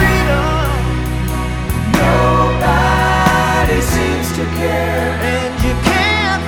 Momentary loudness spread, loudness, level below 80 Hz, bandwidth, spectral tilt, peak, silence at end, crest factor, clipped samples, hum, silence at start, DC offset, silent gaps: 7 LU; -14 LUFS; -22 dBFS; 19 kHz; -5.5 dB/octave; 0 dBFS; 0 s; 14 dB; under 0.1%; none; 0 s; under 0.1%; none